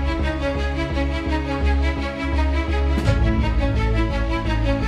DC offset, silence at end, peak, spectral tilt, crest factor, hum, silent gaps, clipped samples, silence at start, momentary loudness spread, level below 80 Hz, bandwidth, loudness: under 0.1%; 0 s; -6 dBFS; -7 dB/octave; 14 dB; none; none; under 0.1%; 0 s; 4 LU; -22 dBFS; 8.8 kHz; -22 LUFS